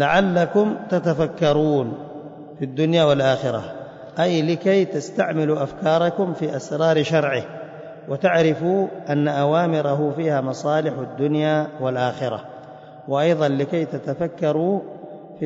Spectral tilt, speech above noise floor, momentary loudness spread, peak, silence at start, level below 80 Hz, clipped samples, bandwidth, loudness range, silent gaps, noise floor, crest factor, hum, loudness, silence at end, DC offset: -7 dB/octave; 20 dB; 17 LU; -6 dBFS; 0 s; -60 dBFS; under 0.1%; 7.8 kHz; 3 LU; none; -40 dBFS; 14 dB; none; -21 LUFS; 0 s; under 0.1%